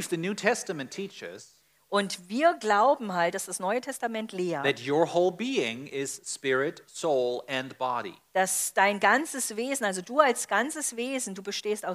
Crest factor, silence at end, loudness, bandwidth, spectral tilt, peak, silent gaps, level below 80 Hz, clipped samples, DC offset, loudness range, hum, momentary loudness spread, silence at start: 22 dB; 0 s; -28 LUFS; 15.5 kHz; -3 dB/octave; -6 dBFS; none; -82 dBFS; under 0.1%; under 0.1%; 3 LU; none; 10 LU; 0 s